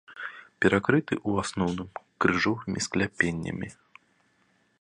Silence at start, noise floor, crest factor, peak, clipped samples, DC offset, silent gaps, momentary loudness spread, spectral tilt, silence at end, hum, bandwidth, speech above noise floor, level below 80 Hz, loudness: 0.1 s; -68 dBFS; 24 dB; -6 dBFS; under 0.1%; under 0.1%; none; 16 LU; -5 dB/octave; 1.1 s; none; 11 kHz; 41 dB; -54 dBFS; -27 LUFS